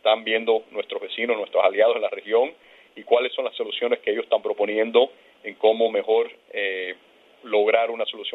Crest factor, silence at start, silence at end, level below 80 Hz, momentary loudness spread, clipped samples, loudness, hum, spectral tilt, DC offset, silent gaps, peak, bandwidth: 20 dB; 0.05 s; 0.05 s; -82 dBFS; 10 LU; under 0.1%; -23 LUFS; none; -5 dB/octave; under 0.1%; none; -2 dBFS; 4.1 kHz